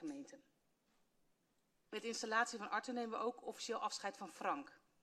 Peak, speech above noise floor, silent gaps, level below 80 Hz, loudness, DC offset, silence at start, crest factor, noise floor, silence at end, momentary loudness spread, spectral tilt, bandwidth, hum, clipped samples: -24 dBFS; 38 dB; none; -90 dBFS; -43 LUFS; under 0.1%; 0 s; 22 dB; -81 dBFS; 0.25 s; 12 LU; -2 dB/octave; 13.5 kHz; none; under 0.1%